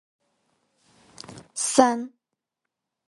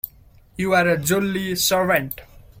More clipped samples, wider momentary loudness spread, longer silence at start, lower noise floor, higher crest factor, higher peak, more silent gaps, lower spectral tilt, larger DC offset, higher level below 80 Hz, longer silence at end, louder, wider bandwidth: neither; first, 24 LU vs 16 LU; first, 1.3 s vs 0.05 s; first, -85 dBFS vs -50 dBFS; first, 28 dB vs 18 dB; first, 0 dBFS vs -4 dBFS; neither; about the same, -2.5 dB/octave vs -3.5 dB/octave; neither; second, -70 dBFS vs -48 dBFS; first, 1 s vs 0 s; about the same, -22 LUFS vs -20 LUFS; second, 11.5 kHz vs 16.5 kHz